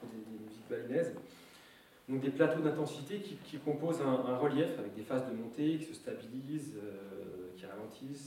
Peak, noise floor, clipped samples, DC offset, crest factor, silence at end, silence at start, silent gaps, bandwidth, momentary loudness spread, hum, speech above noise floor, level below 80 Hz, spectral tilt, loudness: -16 dBFS; -60 dBFS; under 0.1%; under 0.1%; 22 dB; 0 s; 0 s; none; 16.5 kHz; 16 LU; none; 24 dB; -80 dBFS; -6.5 dB/octave; -37 LUFS